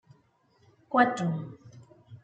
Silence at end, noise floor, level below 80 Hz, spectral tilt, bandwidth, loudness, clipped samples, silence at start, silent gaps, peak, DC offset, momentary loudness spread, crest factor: 0.1 s; -66 dBFS; -74 dBFS; -6.5 dB/octave; 8.8 kHz; -27 LUFS; under 0.1%; 0.9 s; none; -8 dBFS; under 0.1%; 21 LU; 24 dB